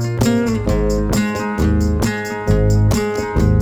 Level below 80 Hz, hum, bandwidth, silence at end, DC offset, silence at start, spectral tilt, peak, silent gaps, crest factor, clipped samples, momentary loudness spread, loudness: -22 dBFS; none; over 20 kHz; 0 s; under 0.1%; 0 s; -6.5 dB/octave; -2 dBFS; none; 14 dB; under 0.1%; 4 LU; -17 LUFS